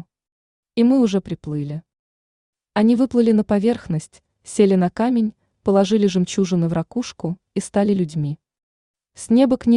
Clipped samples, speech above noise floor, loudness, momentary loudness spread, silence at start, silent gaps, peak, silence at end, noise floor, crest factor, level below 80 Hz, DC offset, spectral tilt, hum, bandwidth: under 0.1%; over 72 dB; -19 LUFS; 12 LU; 0.75 s; 1.99-2.53 s, 8.63-8.94 s; -4 dBFS; 0 s; under -90 dBFS; 16 dB; -54 dBFS; under 0.1%; -7 dB/octave; none; 11 kHz